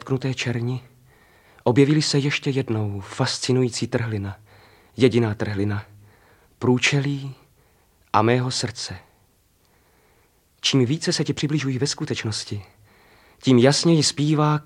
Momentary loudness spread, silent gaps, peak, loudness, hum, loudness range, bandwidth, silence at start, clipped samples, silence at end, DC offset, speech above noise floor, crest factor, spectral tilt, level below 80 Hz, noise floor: 14 LU; none; -2 dBFS; -22 LUFS; none; 4 LU; 12 kHz; 0.05 s; under 0.1%; 0.05 s; under 0.1%; 40 dB; 22 dB; -5 dB/octave; -60 dBFS; -61 dBFS